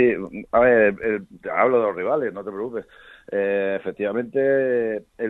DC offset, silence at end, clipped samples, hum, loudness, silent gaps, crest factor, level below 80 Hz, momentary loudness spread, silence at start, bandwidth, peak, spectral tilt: under 0.1%; 0 s; under 0.1%; none; -22 LUFS; none; 18 dB; -56 dBFS; 12 LU; 0 s; 4 kHz; -4 dBFS; -8.5 dB/octave